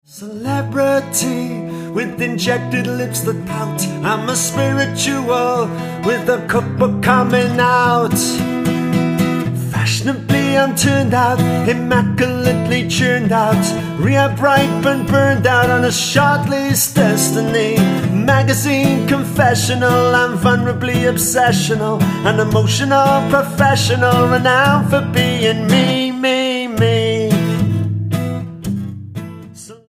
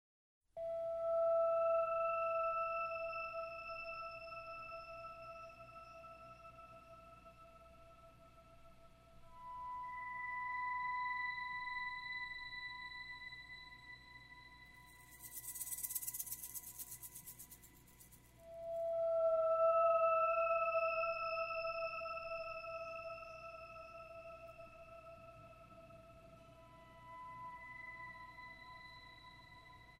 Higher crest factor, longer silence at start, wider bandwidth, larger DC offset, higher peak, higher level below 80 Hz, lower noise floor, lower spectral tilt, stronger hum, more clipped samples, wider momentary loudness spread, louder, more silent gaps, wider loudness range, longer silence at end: about the same, 14 dB vs 18 dB; second, 0.15 s vs 0.55 s; about the same, 15.5 kHz vs 16 kHz; neither; first, 0 dBFS vs -24 dBFS; first, -44 dBFS vs -70 dBFS; second, -35 dBFS vs -63 dBFS; first, -5 dB/octave vs -2 dB/octave; second, none vs 60 Hz at -70 dBFS; neither; second, 7 LU vs 24 LU; first, -15 LUFS vs -40 LUFS; neither; second, 4 LU vs 20 LU; about the same, 0.15 s vs 0.05 s